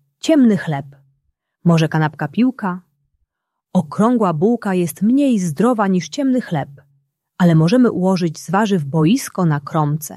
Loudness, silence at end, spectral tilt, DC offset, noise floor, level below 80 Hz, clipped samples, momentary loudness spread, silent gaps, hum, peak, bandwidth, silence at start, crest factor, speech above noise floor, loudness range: -17 LUFS; 0 s; -7 dB/octave; under 0.1%; -76 dBFS; -60 dBFS; under 0.1%; 8 LU; none; none; -2 dBFS; 13 kHz; 0.25 s; 14 dB; 60 dB; 3 LU